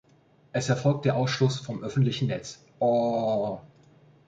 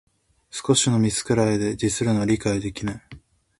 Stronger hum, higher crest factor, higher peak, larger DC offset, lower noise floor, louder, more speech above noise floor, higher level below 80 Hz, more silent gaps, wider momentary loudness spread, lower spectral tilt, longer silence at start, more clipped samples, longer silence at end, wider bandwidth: neither; about the same, 18 dB vs 18 dB; second, -10 dBFS vs -4 dBFS; neither; first, -60 dBFS vs -44 dBFS; second, -27 LUFS vs -22 LUFS; first, 35 dB vs 22 dB; second, -62 dBFS vs -48 dBFS; neither; second, 9 LU vs 12 LU; first, -6 dB/octave vs -4.5 dB/octave; about the same, 0.55 s vs 0.55 s; neither; first, 0.6 s vs 0.4 s; second, 8.6 kHz vs 11.5 kHz